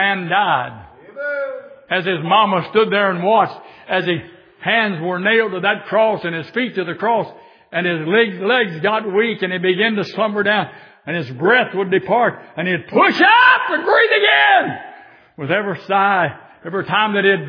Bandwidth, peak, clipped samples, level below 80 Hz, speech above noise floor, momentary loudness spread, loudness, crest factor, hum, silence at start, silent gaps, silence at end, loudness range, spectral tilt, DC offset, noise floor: 5.4 kHz; 0 dBFS; under 0.1%; -66 dBFS; 26 dB; 13 LU; -16 LUFS; 16 dB; none; 0 s; none; 0 s; 5 LU; -7 dB/octave; under 0.1%; -42 dBFS